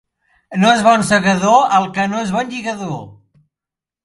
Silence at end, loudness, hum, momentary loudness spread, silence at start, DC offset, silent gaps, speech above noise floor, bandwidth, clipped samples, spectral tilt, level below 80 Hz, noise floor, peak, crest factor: 0.9 s; -14 LUFS; none; 14 LU; 0.5 s; under 0.1%; none; 73 dB; 11.5 kHz; under 0.1%; -4.5 dB/octave; -54 dBFS; -88 dBFS; 0 dBFS; 16 dB